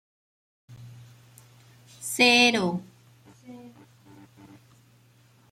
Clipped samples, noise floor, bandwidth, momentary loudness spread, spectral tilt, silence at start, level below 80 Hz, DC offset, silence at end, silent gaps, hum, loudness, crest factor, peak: under 0.1%; -59 dBFS; 16 kHz; 30 LU; -3 dB/octave; 0.7 s; -72 dBFS; under 0.1%; 1.85 s; none; none; -21 LUFS; 22 dB; -8 dBFS